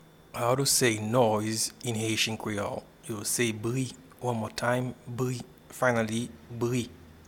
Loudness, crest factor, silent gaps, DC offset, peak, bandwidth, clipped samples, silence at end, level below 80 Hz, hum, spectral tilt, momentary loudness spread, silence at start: -29 LUFS; 20 dB; none; under 0.1%; -10 dBFS; 18.5 kHz; under 0.1%; 0.1 s; -60 dBFS; none; -4 dB/octave; 13 LU; 0.35 s